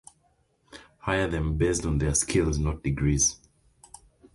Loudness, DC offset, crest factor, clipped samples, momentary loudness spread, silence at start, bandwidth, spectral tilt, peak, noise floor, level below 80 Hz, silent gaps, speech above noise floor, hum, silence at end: -26 LUFS; under 0.1%; 18 dB; under 0.1%; 6 LU; 0.75 s; 11.5 kHz; -4.5 dB/octave; -10 dBFS; -68 dBFS; -36 dBFS; none; 42 dB; none; 1 s